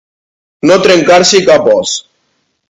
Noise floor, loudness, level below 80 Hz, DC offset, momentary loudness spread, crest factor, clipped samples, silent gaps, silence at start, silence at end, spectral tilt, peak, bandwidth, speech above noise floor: -61 dBFS; -7 LUFS; -50 dBFS; under 0.1%; 10 LU; 10 dB; 1%; none; 0.65 s; 0.7 s; -3 dB/octave; 0 dBFS; 11 kHz; 54 dB